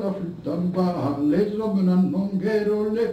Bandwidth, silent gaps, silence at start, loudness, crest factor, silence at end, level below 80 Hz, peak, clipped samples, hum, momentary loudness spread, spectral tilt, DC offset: 8.4 kHz; none; 0 s; -23 LUFS; 12 dB; 0 s; -56 dBFS; -10 dBFS; under 0.1%; none; 7 LU; -9 dB/octave; under 0.1%